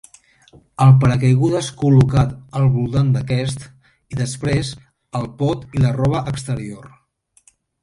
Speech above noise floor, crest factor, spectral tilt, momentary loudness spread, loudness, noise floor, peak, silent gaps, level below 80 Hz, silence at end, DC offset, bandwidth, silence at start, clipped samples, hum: 40 dB; 16 dB; -7 dB/octave; 16 LU; -18 LUFS; -57 dBFS; -2 dBFS; none; -40 dBFS; 0.95 s; under 0.1%; 11.5 kHz; 0.8 s; under 0.1%; none